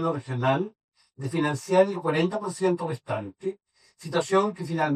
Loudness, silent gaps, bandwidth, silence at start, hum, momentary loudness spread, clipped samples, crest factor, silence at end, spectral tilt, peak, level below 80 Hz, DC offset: -27 LUFS; 0.84-0.92 s; 13.5 kHz; 0 s; none; 13 LU; under 0.1%; 20 dB; 0 s; -6 dB/octave; -8 dBFS; -70 dBFS; under 0.1%